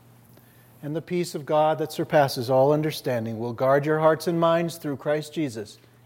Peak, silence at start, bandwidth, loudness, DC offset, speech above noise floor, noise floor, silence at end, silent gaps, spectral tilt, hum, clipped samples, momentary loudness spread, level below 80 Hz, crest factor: -8 dBFS; 0.8 s; 16.5 kHz; -24 LUFS; under 0.1%; 29 dB; -53 dBFS; 0.3 s; none; -6 dB/octave; none; under 0.1%; 10 LU; -70 dBFS; 18 dB